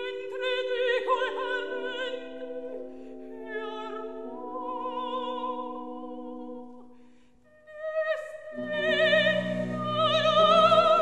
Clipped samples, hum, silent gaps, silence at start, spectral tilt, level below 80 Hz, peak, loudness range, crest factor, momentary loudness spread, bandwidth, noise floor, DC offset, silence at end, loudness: under 0.1%; none; none; 0 s; -5 dB/octave; -66 dBFS; -8 dBFS; 12 LU; 20 dB; 19 LU; 9.4 kHz; -59 dBFS; 0.4%; 0 s; -27 LUFS